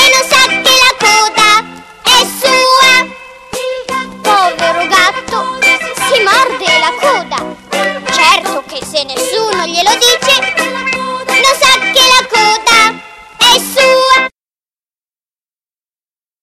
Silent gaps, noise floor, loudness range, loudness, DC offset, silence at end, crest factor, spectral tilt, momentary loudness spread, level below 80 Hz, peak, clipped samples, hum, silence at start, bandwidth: none; under -90 dBFS; 4 LU; -8 LUFS; under 0.1%; 2.15 s; 10 dB; -0.5 dB/octave; 12 LU; -46 dBFS; 0 dBFS; 0.3%; none; 0 s; 18 kHz